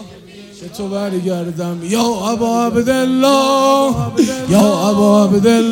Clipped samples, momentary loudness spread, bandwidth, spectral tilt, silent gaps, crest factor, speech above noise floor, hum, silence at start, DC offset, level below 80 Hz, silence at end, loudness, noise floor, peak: under 0.1%; 11 LU; 17 kHz; -5.5 dB/octave; none; 14 dB; 23 dB; none; 0 s; under 0.1%; -46 dBFS; 0 s; -14 LUFS; -36 dBFS; 0 dBFS